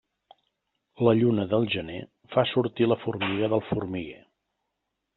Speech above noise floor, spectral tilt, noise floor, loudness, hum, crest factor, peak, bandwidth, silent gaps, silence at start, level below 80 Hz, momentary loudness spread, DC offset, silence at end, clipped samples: 56 dB; -5.5 dB/octave; -82 dBFS; -26 LUFS; none; 20 dB; -8 dBFS; 4.3 kHz; none; 1 s; -62 dBFS; 13 LU; under 0.1%; 1 s; under 0.1%